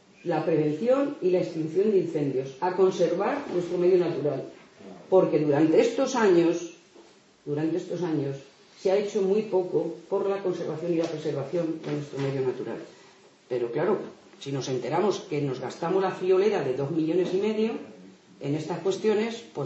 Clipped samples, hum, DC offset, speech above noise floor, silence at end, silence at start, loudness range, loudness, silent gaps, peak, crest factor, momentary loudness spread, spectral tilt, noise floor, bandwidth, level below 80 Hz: under 0.1%; none; under 0.1%; 29 dB; 0 s; 0.25 s; 6 LU; -26 LUFS; none; -10 dBFS; 18 dB; 11 LU; -6.5 dB/octave; -55 dBFS; 8 kHz; -74 dBFS